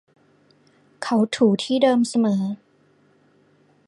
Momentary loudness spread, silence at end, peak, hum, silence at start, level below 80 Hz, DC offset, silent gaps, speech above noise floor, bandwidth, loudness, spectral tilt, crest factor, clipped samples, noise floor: 12 LU; 1.3 s; -4 dBFS; 50 Hz at -40 dBFS; 1 s; -70 dBFS; under 0.1%; none; 40 dB; 11.5 kHz; -21 LUFS; -5.5 dB/octave; 18 dB; under 0.1%; -59 dBFS